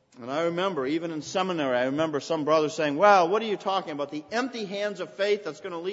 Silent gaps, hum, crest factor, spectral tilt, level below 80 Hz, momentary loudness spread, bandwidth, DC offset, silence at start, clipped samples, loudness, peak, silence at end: none; none; 20 dB; -4.5 dB/octave; -74 dBFS; 11 LU; 8 kHz; under 0.1%; 0.15 s; under 0.1%; -26 LUFS; -6 dBFS; 0 s